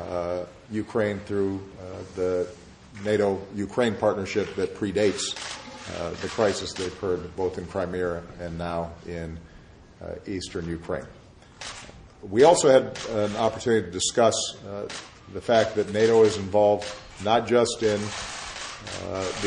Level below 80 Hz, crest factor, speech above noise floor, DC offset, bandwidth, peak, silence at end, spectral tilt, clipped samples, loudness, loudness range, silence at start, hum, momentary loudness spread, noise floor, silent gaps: -54 dBFS; 22 dB; 24 dB; under 0.1%; 11 kHz; -4 dBFS; 0 s; -4.5 dB/octave; under 0.1%; -25 LUFS; 10 LU; 0 s; none; 16 LU; -49 dBFS; none